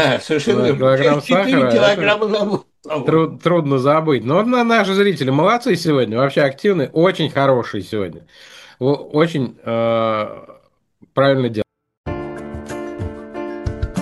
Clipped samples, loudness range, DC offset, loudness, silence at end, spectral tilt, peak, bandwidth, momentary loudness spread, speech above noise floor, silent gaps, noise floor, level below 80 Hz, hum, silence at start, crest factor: under 0.1%; 6 LU; under 0.1%; -17 LUFS; 0 s; -6.5 dB/octave; 0 dBFS; 12.5 kHz; 14 LU; 38 dB; 11.97-12.04 s; -54 dBFS; -42 dBFS; none; 0 s; 16 dB